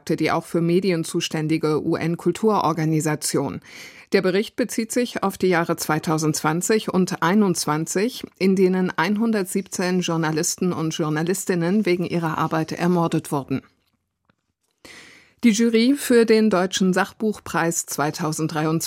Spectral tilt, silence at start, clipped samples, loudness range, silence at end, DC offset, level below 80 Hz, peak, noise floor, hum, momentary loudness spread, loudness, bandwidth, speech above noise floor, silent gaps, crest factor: -5 dB/octave; 0.05 s; under 0.1%; 4 LU; 0 s; under 0.1%; -64 dBFS; -4 dBFS; -73 dBFS; none; 7 LU; -21 LUFS; 16.5 kHz; 52 dB; none; 16 dB